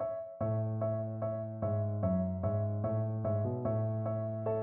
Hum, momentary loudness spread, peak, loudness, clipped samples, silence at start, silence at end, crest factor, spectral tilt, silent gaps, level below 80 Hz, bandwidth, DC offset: none; 4 LU; -20 dBFS; -35 LUFS; under 0.1%; 0 s; 0 s; 12 dB; -12.5 dB/octave; none; -60 dBFS; 2.8 kHz; under 0.1%